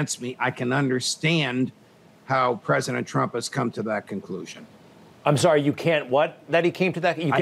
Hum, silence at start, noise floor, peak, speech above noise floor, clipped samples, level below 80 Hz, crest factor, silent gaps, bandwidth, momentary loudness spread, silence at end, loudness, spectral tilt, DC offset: none; 0 s; -50 dBFS; -6 dBFS; 26 dB; under 0.1%; -72 dBFS; 18 dB; none; 15 kHz; 9 LU; 0 s; -24 LUFS; -5 dB/octave; under 0.1%